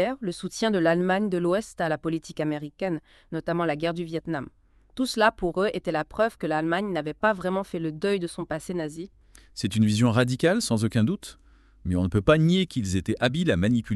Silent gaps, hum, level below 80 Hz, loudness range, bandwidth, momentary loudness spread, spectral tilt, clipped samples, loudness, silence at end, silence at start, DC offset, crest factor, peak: none; none; -50 dBFS; 5 LU; 13 kHz; 11 LU; -6 dB/octave; under 0.1%; -26 LUFS; 0 s; 0 s; under 0.1%; 20 dB; -4 dBFS